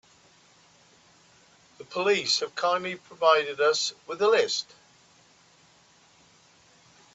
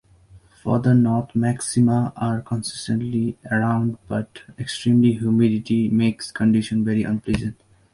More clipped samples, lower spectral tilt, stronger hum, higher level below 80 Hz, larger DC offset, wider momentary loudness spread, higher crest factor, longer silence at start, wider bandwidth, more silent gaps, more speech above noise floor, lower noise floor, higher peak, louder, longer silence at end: neither; second, -1.5 dB/octave vs -6.5 dB/octave; neither; second, -78 dBFS vs -48 dBFS; neither; about the same, 9 LU vs 10 LU; first, 22 dB vs 16 dB; first, 1.8 s vs 0.35 s; second, 8.4 kHz vs 11.5 kHz; neither; first, 34 dB vs 30 dB; first, -59 dBFS vs -50 dBFS; second, -8 dBFS vs -4 dBFS; second, -25 LUFS vs -21 LUFS; first, 2.5 s vs 0.4 s